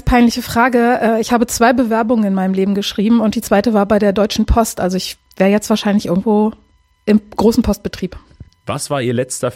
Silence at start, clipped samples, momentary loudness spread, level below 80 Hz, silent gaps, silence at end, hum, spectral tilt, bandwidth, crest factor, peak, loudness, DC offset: 0.05 s; under 0.1%; 9 LU; -30 dBFS; none; 0 s; none; -5.5 dB/octave; 16.5 kHz; 14 dB; 0 dBFS; -15 LUFS; under 0.1%